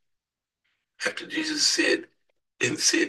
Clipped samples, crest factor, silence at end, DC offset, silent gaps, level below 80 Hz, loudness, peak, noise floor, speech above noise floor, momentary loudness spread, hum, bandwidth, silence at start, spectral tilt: under 0.1%; 20 dB; 0 s; under 0.1%; none; -74 dBFS; -24 LUFS; -8 dBFS; -86 dBFS; 61 dB; 10 LU; none; 12.5 kHz; 1 s; -1 dB/octave